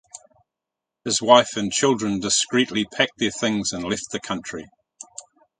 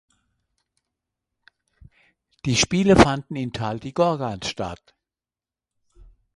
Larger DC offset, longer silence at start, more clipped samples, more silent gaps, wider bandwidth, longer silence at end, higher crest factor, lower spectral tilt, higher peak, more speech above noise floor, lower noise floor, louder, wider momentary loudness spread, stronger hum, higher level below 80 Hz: neither; second, 0.15 s vs 2.45 s; neither; neither; second, 9.6 kHz vs 11.5 kHz; about the same, 0.4 s vs 0.35 s; about the same, 24 dB vs 24 dB; second, -3 dB/octave vs -4.5 dB/octave; about the same, 0 dBFS vs 0 dBFS; second, 64 dB vs over 69 dB; second, -86 dBFS vs under -90 dBFS; about the same, -21 LUFS vs -21 LUFS; first, 21 LU vs 16 LU; neither; second, -58 dBFS vs -44 dBFS